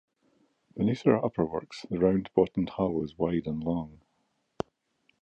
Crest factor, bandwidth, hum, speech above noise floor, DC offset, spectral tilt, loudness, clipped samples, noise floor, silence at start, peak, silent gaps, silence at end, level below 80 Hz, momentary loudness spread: 22 dB; 8.4 kHz; none; 47 dB; under 0.1%; -8.5 dB/octave; -29 LUFS; under 0.1%; -75 dBFS; 0.75 s; -8 dBFS; none; 1.25 s; -56 dBFS; 14 LU